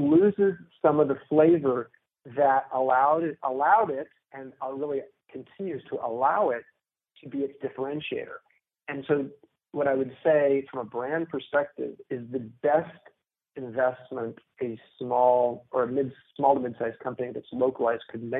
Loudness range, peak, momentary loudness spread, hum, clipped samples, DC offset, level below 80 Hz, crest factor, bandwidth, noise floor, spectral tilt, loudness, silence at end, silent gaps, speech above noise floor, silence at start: 7 LU; -8 dBFS; 16 LU; none; under 0.1%; under 0.1%; -70 dBFS; 20 dB; 4 kHz; -61 dBFS; -10.5 dB/octave; -27 LUFS; 0 s; none; 35 dB; 0 s